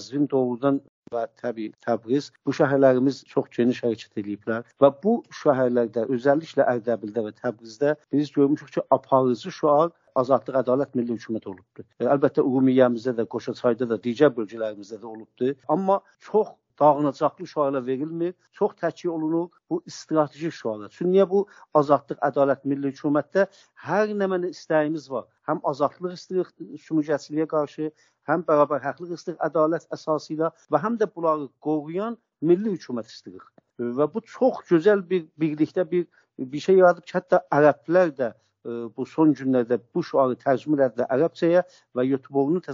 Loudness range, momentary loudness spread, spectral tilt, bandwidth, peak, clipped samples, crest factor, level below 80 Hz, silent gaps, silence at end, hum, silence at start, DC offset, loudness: 4 LU; 12 LU; -6 dB/octave; 7.4 kHz; -2 dBFS; under 0.1%; 20 dB; -74 dBFS; 0.89-1.03 s; 0 s; none; 0 s; under 0.1%; -24 LUFS